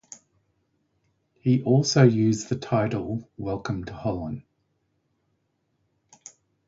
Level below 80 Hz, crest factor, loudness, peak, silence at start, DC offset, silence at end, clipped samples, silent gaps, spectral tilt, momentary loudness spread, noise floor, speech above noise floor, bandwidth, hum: -54 dBFS; 22 dB; -24 LUFS; -4 dBFS; 1.45 s; under 0.1%; 2.25 s; under 0.1%; none; -6.5 dB/octave; 14 LU; -73 dBFS; 50 dB; 7.8 kHz; none